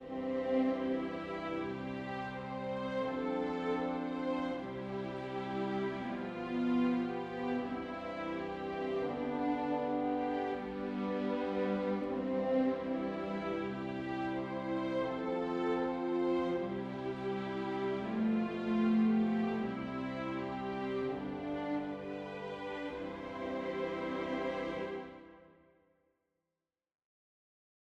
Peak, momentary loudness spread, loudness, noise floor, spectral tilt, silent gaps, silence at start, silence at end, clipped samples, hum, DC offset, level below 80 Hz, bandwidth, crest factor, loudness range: -22 dBFS; 8 LU; -37 LUFS; under -90 dBFS; -7.5 dB/octave; none; 0 s; 2.55 s; under 0.1%; none; under 0.1%; -66 dBFS; 8 kHz; 14 dB; 6 LU